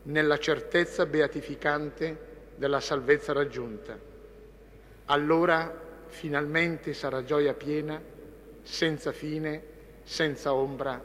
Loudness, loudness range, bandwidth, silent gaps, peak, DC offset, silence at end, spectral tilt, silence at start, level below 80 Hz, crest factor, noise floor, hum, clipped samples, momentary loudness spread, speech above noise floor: -29 LUFS; 4 LU; 15.5 kHz; none; -10 dBFS; under 0.1%; 0 s; -5 dB/octave; 0 s; -54 dBFS; 20 dB; -51 dBFS; none; under 0.1%; 19 LU; 23 dB